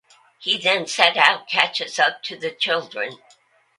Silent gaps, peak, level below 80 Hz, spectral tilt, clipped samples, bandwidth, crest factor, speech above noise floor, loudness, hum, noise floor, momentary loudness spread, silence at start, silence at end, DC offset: none; 0 dBFS; -76 dBFS; -1 dB/octave; under 0.1%; 11.5 kHz; 22 dB; 37 dB; -19 LUFS; none; -57 dBFS; 14 LU; 0.4 s; 0.65 s; under 0.1%